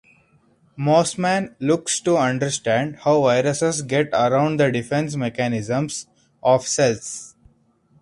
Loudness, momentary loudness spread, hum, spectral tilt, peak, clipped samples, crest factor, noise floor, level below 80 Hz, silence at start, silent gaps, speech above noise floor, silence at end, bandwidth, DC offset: -20 LUFS; 7 LU; none; -4.5 dB/octave; -4 dBFS; under 0.1%; 16 dB; -59 dBFS; -58 dBFS; 0.75 s; none; 39 dB; 0.75 s; 11.5 kHz; under 0.1%